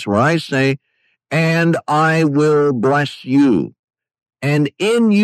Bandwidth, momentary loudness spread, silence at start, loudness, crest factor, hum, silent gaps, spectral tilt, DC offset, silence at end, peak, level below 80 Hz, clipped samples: 13 kHz; 6 LU; 0 s; -16 LUFS; 12 dB; none; 3.79-3.88 s; -6.5 dB/octave; under 0.1%; 0 s; -4 dBFS; -60 dBFS; under 0.1%